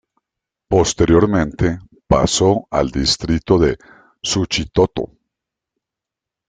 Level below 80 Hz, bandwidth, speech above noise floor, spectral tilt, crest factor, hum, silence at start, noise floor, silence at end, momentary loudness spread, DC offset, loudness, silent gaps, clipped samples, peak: -34 dBFS; 9.6 kHz; 69 dB; -5 dB/octave; 16 dB; none; 0.7 s; -85 dBFS; 1.45 s; 10 LU; under 0.1%; -17 LUFS; none; under 0.1%; -2 dBFS